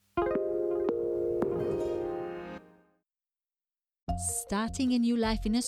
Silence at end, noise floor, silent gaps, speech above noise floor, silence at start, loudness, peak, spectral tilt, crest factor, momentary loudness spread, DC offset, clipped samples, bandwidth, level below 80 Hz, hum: 0 s; under -90 dBFS; 4.03-4.07 s; over 61 dB; 0.15 s; -31 LUFS; -14 dBFS; -5 dB/octave; 18 dB; 11 LU; under 0.1%; under 0.1%; 14 kHz; -48 dBFS; none